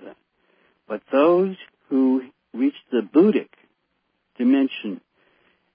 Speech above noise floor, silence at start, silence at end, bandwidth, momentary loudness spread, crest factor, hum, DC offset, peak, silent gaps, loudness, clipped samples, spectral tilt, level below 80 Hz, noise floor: 53 dB; 0.05 s; 0.8 s; 5 kHz; 16 LU; 18 dB; none; under 0.1%; -4 dBFS; none; -21 LUFS; under 0.1%; -11 dB/octave; -80 dBFS; -72 dBFS